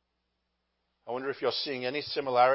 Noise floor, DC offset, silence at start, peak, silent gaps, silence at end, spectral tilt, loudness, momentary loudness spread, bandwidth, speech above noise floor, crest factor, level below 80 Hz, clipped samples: -80 dBFS; under 0.1%; 1.05 s; -10 dBFS; none; 0 s; -7.5 dB/octave; -31 LUFS; 8 LU; 5.8 kHz; 51 dB; 20 dB; -76 dBFS; under 0.1%